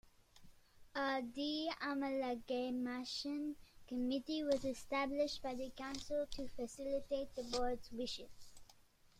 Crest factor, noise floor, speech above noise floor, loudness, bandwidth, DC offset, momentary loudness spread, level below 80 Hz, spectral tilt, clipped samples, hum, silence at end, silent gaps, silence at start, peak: 20 dB; -67 dBFS; 26 dB; -42 LUFS; 15.5 kHz; under 0.1%; 8 LU; -62 dBFS; -3.5 dB/octave; under 0.1%; none; 0.45 s; none; 0.05 s; -22 dBFS